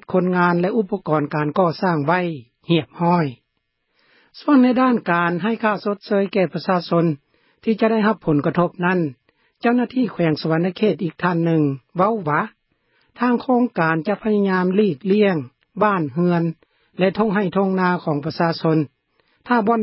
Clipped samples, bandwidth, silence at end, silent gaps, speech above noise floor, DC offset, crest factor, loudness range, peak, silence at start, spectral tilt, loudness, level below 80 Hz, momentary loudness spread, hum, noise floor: under 0.1%; 5.8 kHz; 0 s; none; 54 dB; under 0.1%; 16 dB; 2 LU; -4 dBFS; 0.1 s; -11.5 dB/octave; -20 LUFS; -62 dBFS; 6 LU; none; -72 dBFS